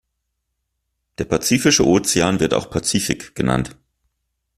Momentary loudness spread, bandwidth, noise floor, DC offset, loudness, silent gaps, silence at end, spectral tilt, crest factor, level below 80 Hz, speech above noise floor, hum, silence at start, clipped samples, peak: 9 LU; 14.5 kHz; -75 dBFS; under 0.1%; -18 LUFS; none; 0.85 s; -4 dB/octave; 18 dB; -44 dBFS; 57 dB; none; 1.2 s; under 0.1%; -2 dBFS